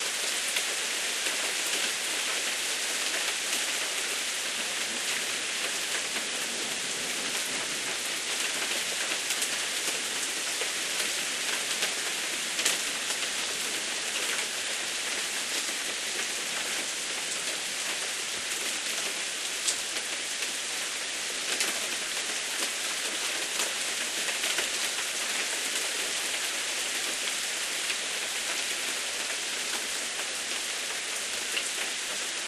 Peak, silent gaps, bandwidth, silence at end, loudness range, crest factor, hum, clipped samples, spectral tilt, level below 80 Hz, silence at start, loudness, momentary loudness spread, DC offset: -6 dBFS; none; 13 kHz; 0 s; 2 LU; 24 dB; none; under 0.1%; 1.5 dB/octave; -72 dBFS; 0 s; -28 LUFS; 3 LU; under 0.1%